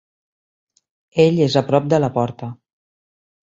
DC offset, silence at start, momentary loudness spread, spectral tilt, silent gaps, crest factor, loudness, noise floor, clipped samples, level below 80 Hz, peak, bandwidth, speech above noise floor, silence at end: under 0.1%; 1.15 s; 14 LU; -7 dB/octave; none; 18 dB; -17 LUFS; under -90 dBFS; under 0.1%; -58 dBFS; -2 dBFS; 7.8 kHz; over 73 dB; 1 s